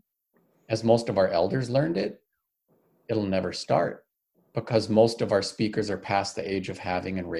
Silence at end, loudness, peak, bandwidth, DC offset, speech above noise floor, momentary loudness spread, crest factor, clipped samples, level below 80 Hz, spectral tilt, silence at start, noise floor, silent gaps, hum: 0 s; -26 LUFS; -6 dBFS; 12 kHz; under 0.1%; 47 dB; 9 LU; 20 dB; under 0.1%; -56 dBFS; -6 dB/octave; 0.7 s; -72 dBFS; none; none